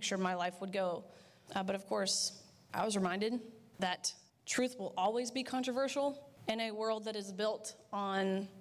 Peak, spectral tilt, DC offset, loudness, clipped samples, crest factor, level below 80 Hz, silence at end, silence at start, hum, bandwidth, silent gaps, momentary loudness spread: -22 dBFS; -3.5 dB/octave; under 0.1%; -37 LUFS; under 0.1%; 14 dB; -78 dBFS; 0 s; 0 s; none; 16 kHz; none; 8 LU